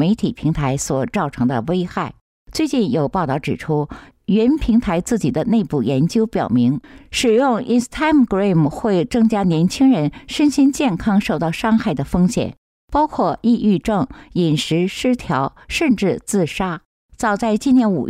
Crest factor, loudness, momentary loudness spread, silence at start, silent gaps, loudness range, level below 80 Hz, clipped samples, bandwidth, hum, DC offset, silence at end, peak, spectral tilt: 10 dB; -18 LUFS; 7 LU; 0 s; 2.21-2.46 s, 12.58-12.88 s, 16.85-17.09 s; 4 LU; -40 dBFS; under 0.1%; 15 kHz; none; under 0.1%; 0 s; -6 dBFS; -6 dB/octave